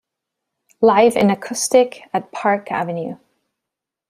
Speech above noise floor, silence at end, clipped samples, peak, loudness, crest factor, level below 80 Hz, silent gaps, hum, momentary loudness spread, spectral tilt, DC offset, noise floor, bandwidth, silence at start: 67 dB; 0.95 s; under 0.1%; -2 dBFS; -17 LUFS; 18 dB; -62 dBFS; none; none; 12 LU; -4.5 dB/octave; under 0.1%; -84 dBFS; 15 kHz; 0.8 s